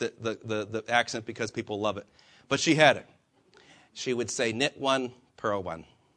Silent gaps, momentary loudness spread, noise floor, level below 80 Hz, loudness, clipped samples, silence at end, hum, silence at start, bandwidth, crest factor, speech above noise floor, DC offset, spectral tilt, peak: none; 15 LU; -61 dBFS; -68 dBFS; -28 LUFS; under 0.1%; 0.35 s; none; 0 s; 10.5 kHz; 24 dB; 32 dB; under 0.1%; -3.5 dB/octave; -4 dBFS